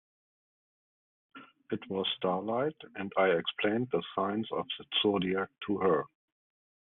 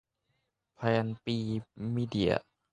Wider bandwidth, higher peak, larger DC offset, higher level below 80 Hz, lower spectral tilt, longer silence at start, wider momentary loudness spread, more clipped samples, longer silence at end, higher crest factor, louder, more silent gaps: second, 4.1 kHz vs 10 kHz; about the same, -14 dBFS vs -12 dBFS; neither; second, -74 dBFS vs -58 dBFS; second, -3 dB/octave vs -7.5 dB/octave; first, 1.35 s vs 0.8 s; about the same, 8 LU vs 6 LU; neither; first, 0.8 s vs 0.3 s; about the same, 20 dB vs 20 dB; about the same, -32 LUFS vs -32 LUFS; neither